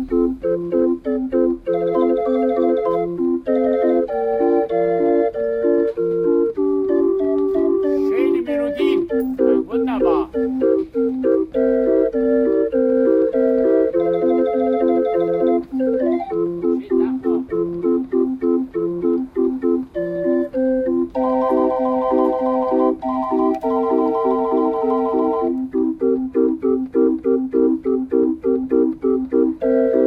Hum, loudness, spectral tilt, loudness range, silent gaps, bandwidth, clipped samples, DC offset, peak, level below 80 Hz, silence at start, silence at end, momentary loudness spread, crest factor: none; -19 LUFS; -9 dB/octave; 3 LU; none; 5 kHz; under 0.1%; under 0.1%; -4 dBFS; -48 dBFS; 0 s; 0 s; 4 LU; 14 dB